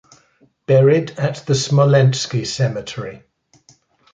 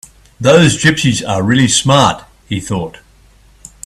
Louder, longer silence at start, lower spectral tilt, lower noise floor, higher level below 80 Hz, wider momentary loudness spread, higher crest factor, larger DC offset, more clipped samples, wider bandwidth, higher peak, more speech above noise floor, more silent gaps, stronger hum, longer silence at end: second, -16 LUFS vs -12 LUFS; first, 0.7 s vs 0.4 s; first, -6 dB/octave vs -4.5 dB/octave; first, -56 dBFS vs -46 dBFS; second, -56 dBFS vs -42 dBFS; about the same, 16 LU vs 14 LU; about the same, 16 dB vs 14 dB; neither; neither; second, 9 kHz vs 13.5 kHz; about the same, -2 dBFS vs 0 dBFS; first, 40 dB vs 34 dB; neither; neither; about the same, 1 s vs 0.95 s